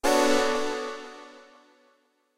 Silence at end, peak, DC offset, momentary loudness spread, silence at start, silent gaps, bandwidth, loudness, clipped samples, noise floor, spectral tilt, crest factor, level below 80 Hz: 0.95 s; -8 dBFS; under 0.1%; 24 LU; 0.05 s; none; 16 kHz; -25 LUFS; under 0.1%; -67 dBFS; -1.5 dB/octave; 20 dB; -54 dBFS